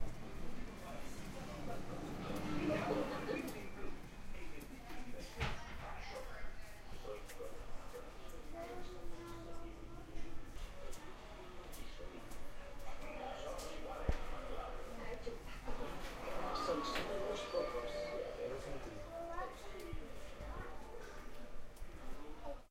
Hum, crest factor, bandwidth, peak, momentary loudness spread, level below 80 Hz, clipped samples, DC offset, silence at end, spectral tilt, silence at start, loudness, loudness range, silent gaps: none; 22 dB; 16 kHz; -22 dBFS; 13 LU; -50 dBFS; under 0.1%; under 0.1%; 0.05 s; -5 dB/octave; 0 s; -47 LUFS; 10 LU; none